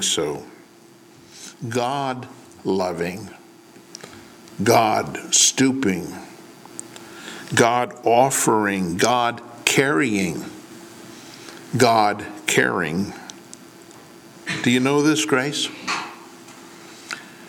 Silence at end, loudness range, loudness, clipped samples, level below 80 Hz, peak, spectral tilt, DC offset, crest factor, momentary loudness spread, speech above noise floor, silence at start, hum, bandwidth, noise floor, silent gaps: 0 s; 8 LU; -20 LUFS; under 0.1%; -62 dBFS; -2 dBFS; -3 dB/octave; under 0.1%; 22 dB; 24 LU; 29 dB; 0 s; none; 19 kHz; -48 dBFS; none